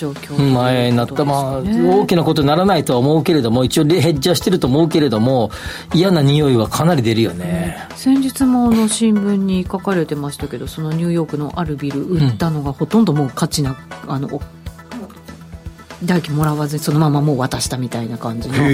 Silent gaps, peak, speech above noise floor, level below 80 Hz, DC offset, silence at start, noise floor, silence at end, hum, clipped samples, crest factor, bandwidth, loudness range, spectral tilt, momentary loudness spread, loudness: none; -4 dBFS; 20 dB; -40 dBFS; under 0.1%; 0 s; -35 dBFS; 0 s; none; under 0.1%; 12 dB; 16 kHz; 6 LU; -6 dB/octave; 12 LU; -16 LUFS